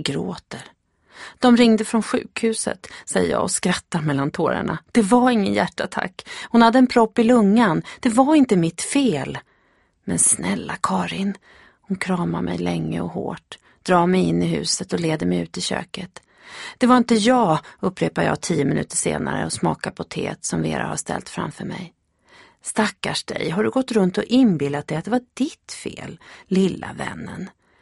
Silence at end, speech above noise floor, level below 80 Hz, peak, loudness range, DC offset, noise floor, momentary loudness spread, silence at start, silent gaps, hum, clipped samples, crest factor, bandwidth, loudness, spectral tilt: 0.35 s; 41 dB; -54 dBFS; 0 dBFS; 8 LU; under 0.1%; -62 dBFS; 17 LU; 0 s; none; none; under 0.1%; 20 dB; 11.5 kHz; -20 LUFS; -4.5 dB/octave